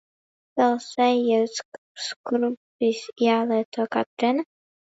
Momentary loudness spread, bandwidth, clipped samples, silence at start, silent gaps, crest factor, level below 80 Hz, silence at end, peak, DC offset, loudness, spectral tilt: 11 LU; 8 kHz; under 0.1%; 0.55 s; 1.65-1.72 s, 1.78-1.95 s, 2.16-2.24 s, 2.57-2.79 s, 3.65-3.72 s, 4.06-4.17 s; 16 dB; -78 dBFS; 0.5 s; -8 dBFS; under 0.1%; -24 LUFS; -4 dB/octave